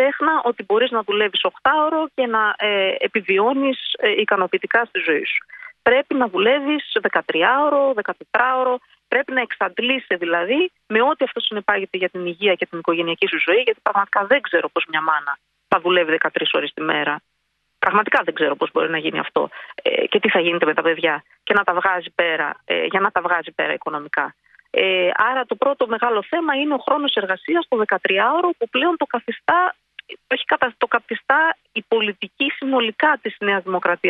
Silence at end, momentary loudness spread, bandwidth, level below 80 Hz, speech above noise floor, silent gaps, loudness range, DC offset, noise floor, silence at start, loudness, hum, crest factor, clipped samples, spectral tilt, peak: 0 s; 6 LU; 4.9 kHz; -68 dBFS; 51 dB; none; 2 LU; under 0.1%; -70 dBFS; 0 s; -19 LUFS; none; 18 dB; under 0.1%; -6.5 dB/octave; -2 dBFS